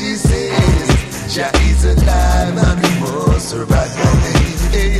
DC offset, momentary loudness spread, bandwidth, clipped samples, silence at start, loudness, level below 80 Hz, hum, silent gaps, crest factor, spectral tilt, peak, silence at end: under 0.1%; 4 LU; 14 kHz; under 0.1%; 0 s; -14 LUFS; -16 dBFS; none; none; 12 dB; -5.5 dB/octave; 0 dBFS; 0 s